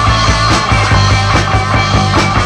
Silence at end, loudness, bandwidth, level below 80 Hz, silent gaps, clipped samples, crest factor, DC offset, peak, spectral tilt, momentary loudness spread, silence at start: 0 s; -10 LUFS; 11 kHz; -20 dBFS; none; under 0.1%; 10 dB; under 0.1%; 0 dBFS; -4.5 dB/octave; 2 LU; 0 s